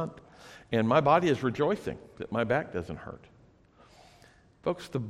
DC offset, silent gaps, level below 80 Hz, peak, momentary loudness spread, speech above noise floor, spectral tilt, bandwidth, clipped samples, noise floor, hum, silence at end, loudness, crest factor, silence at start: under 0.1%; none; -60 dBFS; -10 dBFS; 21 LU; 31 dB; -7 dB/octave; 13 kHz; under 0.1%; -59 dBFS; none; 0 s; -29 LUFS; 22 dB; 0 s